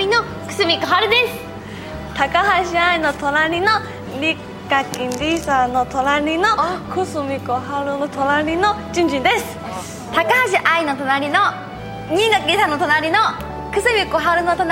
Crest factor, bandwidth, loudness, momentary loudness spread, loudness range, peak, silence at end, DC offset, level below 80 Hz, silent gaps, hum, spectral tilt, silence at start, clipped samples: 16 dB; 16.5 kHz; -17 LUFS; 12 LU; 2 LU; -2 dBFS; 0 s; under 0.1%; -42 dBFS; none; none; -4 dB/octave; 0 s; under 0.1%